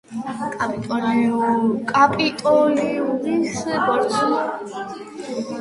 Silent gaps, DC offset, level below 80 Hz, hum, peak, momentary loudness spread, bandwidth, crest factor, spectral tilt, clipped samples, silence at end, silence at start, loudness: none; under 0.1%; -60 dBFS; none; -2 dBFS; 13 LU; 11.5 kHz; 18 dB; -5 dB/octave; under 0.1%; 0 s; 0.1 s; -20 LUFS